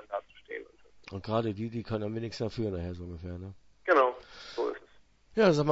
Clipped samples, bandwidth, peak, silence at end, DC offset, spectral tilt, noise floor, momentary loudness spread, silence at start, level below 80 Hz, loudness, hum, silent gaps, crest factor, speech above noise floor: under 0.1%; 8 kHz; -10 dBFS; 0 s; under 0.1%; -6.5 dB/octave; -59 dBFS; 18 LU; 0 s; -58 dBFS; -31 LUFS; none; none; 22 dB; 29 dB